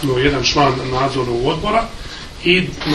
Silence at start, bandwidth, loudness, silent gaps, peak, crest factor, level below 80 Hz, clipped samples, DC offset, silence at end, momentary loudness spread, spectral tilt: 0 s; 13 kHz; -16 LUFS; none; 0 dBFS; 18 dB; -32 dBFS; under 0.1%; under 0.1%; 0 s; 10 LU; -4.5 dB/octave